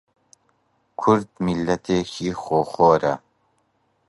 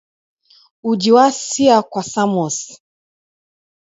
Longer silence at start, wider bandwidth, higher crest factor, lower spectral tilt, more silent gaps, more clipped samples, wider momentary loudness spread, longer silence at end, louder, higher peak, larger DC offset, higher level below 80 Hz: first, 1 s vs 0.85 s; first, 11.5 kHz vs 8 kHz; about the same, 20 dB vs 18 dB; first, -6.5 dB/octave vs -4 dB/octave; neither; neither; about the same, 11 LU vs 13 LU; second, 0.9 s vs 1.25 s; second, -21 LUFS vs -15 LUFS; about the same, -2 dBFS vs 0 dBFS; neither; first, -52 dBFS vs -64 dBFS